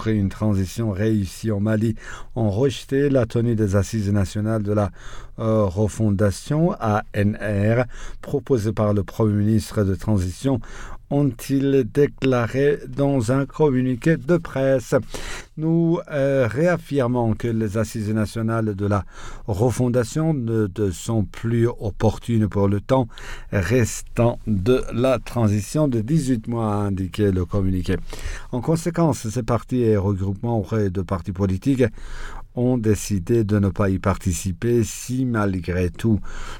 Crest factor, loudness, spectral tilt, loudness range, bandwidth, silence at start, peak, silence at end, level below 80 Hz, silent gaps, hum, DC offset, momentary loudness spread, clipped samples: 14 dB; -22 LUFS; -7 dB/octave; 2 LU; 17 kHz; 0 s; -6 dBFS; 0 s; -38 dBFS; none; none; under 0.1%; 6 LU; under 0.1%